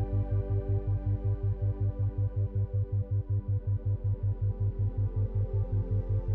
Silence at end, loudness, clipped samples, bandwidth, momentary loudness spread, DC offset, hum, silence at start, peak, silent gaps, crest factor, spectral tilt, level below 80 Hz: 0 s; -31 LUFS; under 0.1%; 2 kHz; 1 LU; under 0.1%; none; 0 s; -20 dBFS; none; 10 dB; -12.5 dB/octave; -38 dBFS